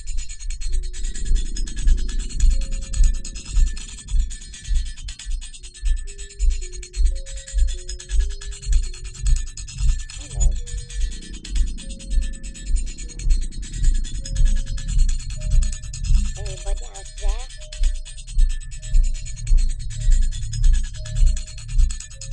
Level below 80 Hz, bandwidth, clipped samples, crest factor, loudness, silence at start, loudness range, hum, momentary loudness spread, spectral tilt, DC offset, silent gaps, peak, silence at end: -20 dBFS; 9.6 kHz; under 0.1%; 16 dB; -27 LUFS; 0 s; 3 LU; none; 9 LU; -3.5 dB/octave; under 0.1%; none; -4 dBFS; 0 s